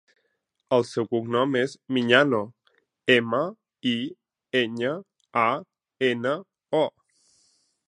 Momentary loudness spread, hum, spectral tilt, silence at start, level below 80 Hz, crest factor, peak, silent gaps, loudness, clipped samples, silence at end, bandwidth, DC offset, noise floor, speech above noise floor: 11 LU; none; -5.5 dB/octave; 0.7 s; -74 dBFS; 24 dB; -2 dBFS; none; -25 LUFS; under 0.1%; 1 s; 11 kHz; under 0.1%; -75 dBFS; 52 dB